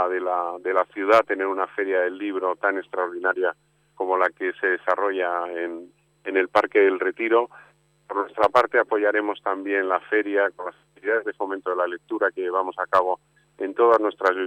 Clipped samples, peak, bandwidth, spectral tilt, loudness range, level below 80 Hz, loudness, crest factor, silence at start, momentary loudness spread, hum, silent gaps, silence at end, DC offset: under 0.1%; -6 dBFS; 10 kHz; -5 dB/octave; 3 LU; -70 dBFS; -23 LUFS; 18 dB; 0 s; 10 LU; none; none; 0 s; under 0.1%